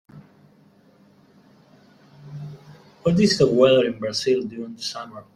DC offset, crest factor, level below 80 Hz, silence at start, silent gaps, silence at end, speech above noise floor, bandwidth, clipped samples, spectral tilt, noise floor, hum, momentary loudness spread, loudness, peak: under 0.1%; 20 dB; -56 dBFS; 0.15 s; none; 0.15 s; 35 dB; 13 kHz; under 0.1%; -5.5 dB/octave; -55 dBFS; none; 22 LU; -20 LUFS; -4 dBFS